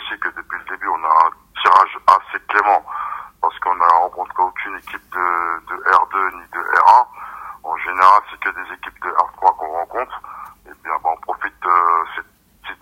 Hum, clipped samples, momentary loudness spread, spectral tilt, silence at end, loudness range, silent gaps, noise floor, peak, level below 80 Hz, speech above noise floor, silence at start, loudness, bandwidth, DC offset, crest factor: none; under 0.1%; 16 LU; -2.5 dB/octave; 0.1 s; 5 LU; none; -38 dBFS; 0 dBFS; -58 dBFS; 20 dB; 0 s; -17 LUFS; 16.5 kHz; under 0.1%; 18 dB